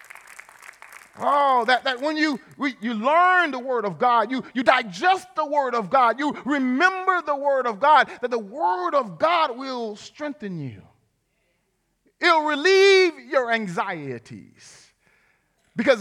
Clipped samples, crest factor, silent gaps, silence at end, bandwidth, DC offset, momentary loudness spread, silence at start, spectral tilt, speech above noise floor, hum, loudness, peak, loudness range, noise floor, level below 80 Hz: under 0.1%; 20 dB; none; 0 s; 12 kHz; under 0.1%; 15 LU; 0.9 s; -4 dB/octave; 50 dB; none; -21 LUFS; -2 dBFS; 5 LU; -71 dBFS; -74 dBFS